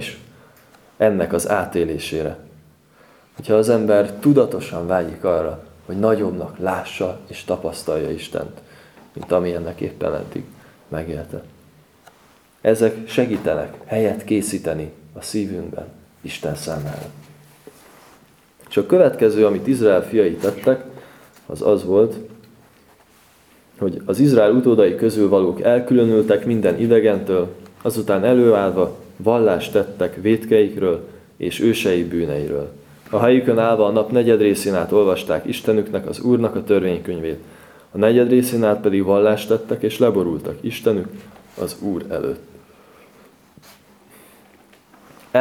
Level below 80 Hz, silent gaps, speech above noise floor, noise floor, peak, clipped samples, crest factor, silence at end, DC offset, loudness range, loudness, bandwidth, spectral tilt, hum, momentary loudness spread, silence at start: -52 dBFS; none; 35 dB; -53 dBFS; 0 dBFS; under 0.1%; 18 dB; 0 s; under 0.1%; 10 LU; -19 LUFS; 16.5 kHz; -6.5 dB/octave; none; 14 LU; 0 s